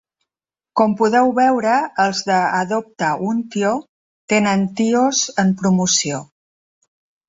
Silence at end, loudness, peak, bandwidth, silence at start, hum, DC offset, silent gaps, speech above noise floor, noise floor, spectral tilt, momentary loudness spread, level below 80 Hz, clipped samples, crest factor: 1.05 s; -17 LUFS; -2 dBFS; 8 kHz; 0.75 s; none; under 0.1%; 3.89-4.28 s; 73 dB; -90 dBFS; -4 dB/octave; 7 LU; -60 dBFS; under 0.1%; 16 dB